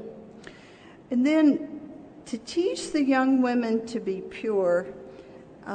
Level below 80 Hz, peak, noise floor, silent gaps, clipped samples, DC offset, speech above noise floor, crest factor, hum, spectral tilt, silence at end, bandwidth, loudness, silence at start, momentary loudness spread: -64 dBFS; -12 dBFS; -49 dBFS; none; under 0.1%; under 0.1%; 25 dB; 16 dB; none; -5 dB/octave; 0 s; 9.4 kHz; -25 LUFS; 0 s; 23 LU